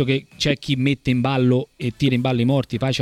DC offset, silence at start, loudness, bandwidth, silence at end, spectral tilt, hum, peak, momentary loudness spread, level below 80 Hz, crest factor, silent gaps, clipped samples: under 0.1%; 0 s; -20 LUFS; 12.5 kHz; 0 s; -6.5 dB/octave; none; -4 dBFS; 4 LU; -46 dBFS; 16 dB; none; under 0.1%